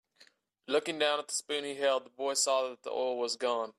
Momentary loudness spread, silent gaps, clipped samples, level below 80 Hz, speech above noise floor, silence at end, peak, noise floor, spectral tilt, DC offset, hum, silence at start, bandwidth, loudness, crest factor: 5 LU; none; under 0.1%; -86 dBFS; 33 dB; 0.05 s; -16 dBFS; -65 dBFS; -0.5 dB/octave; under 0.1%; none; 0.7 s; 14.5 kHz; -32 LUFS; 16 dB